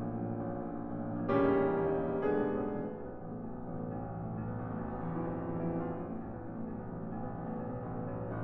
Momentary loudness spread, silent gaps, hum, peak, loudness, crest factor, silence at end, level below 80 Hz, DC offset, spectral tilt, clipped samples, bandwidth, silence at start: 12 LU; none; none; -18 dBFS; -37 LUFS; 18 dB; 0 s; -54 dBFS; under 0.1%; -8.5 dB/octave; under 0.1%; 4.3 kHz; 0 s